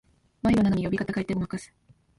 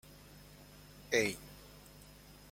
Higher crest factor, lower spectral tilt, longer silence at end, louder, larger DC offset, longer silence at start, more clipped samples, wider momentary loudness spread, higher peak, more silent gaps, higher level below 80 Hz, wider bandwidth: second, 16 dB vs 26 dB; first, -7.5 dB/octave vs -3 dB/octave; first, 0.5 s vs 0.2 s; first, -26 LUFS vs -35 LUFS; neither; about the same, 0.45 s vs 0.35 s; neither; second, 10 LU vs 23 LU; first, -12 dBFS vs -16 dBFS; neither; first, -48 dBFS vs -62 dBFS; second, 11.5 kHz vs 16.5 kHz